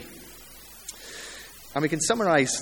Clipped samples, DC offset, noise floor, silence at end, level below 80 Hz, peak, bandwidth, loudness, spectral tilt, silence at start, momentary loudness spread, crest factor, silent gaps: under 0.1%; under 0.1%; -47 dBFS; 0 s; -58 dBFS; -6 dBFS; 19 kHz; -24 LUFS; -3.5 dB/octave; 0 s; 22 LU; 22 dB; none